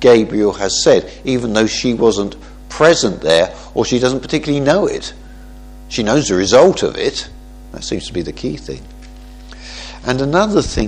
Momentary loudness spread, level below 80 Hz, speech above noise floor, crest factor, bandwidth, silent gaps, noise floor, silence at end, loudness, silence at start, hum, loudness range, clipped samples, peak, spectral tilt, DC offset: 19 LU; -34 dBFS; 20 dB; 16 dB; 10.5 kHz; none; -35 dBFS; 0 s; -15 LUFS; 0 s; 50 Hz at -35 dBFS; 7 LU; under 0.1%; 0 dBFS; -4.5 dB/octave; under 0.1%